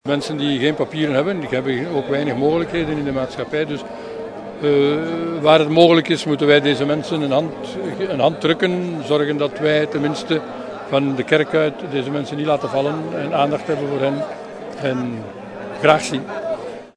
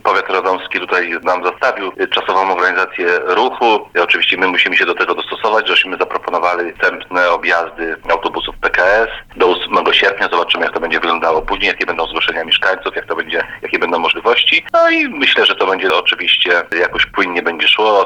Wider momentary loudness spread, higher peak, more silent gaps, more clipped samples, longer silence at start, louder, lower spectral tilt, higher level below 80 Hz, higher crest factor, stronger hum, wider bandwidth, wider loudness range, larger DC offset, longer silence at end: first, 13 LU vs 6 LU; about the same, 0 dBFS vs -2 dBFS; neither; neither; about the same, 0.05 s vs 0.05 s; second, -19 LUFS vs -13 LUFS; first, -6 dB/octave vs -3 dB/octave; second, -54 dBFS vs -44 dBFS; first, 18 dB vs 12 dB; neither; second, 10.5 kHz vs 12 kHz; first, 6 LU vs 3 LU; neither; about the same, 0.05 s vs 0 s